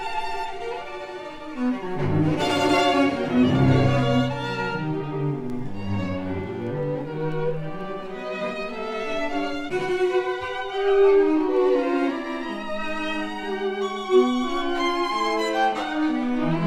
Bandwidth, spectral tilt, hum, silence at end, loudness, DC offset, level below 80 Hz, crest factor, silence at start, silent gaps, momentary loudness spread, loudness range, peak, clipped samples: 12.5 kHz; -6.5 dB/octave; none; 0 s; -24 LUFS; under 0.1%; -46 dBFS; 16 dB; 0 s; none; 12 LU; 7 LU; -8 dBFS; under 0.1%